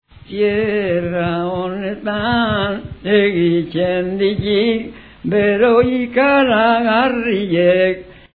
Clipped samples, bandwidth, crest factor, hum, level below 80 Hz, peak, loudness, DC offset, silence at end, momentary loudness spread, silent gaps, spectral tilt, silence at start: under 0.1%; 4.9 kHz; 16 dB; none; -44 dBFS; 0 dBFS; -16 LUFS; 0.2%; 0.2 s; 10 LU; none; -9.5 dB/octave; 0.3 s